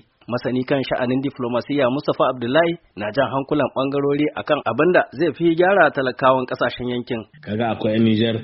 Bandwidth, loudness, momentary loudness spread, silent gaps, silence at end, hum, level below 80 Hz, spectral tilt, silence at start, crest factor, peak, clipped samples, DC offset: 5.8 kHz; -20 LUFS; 9 LU; none; 0 s; none; -56 dBFS; -4.5 dB/octave; 0.3 s; 20 dB; 0 dBFS; under 0.1%; under 0.1%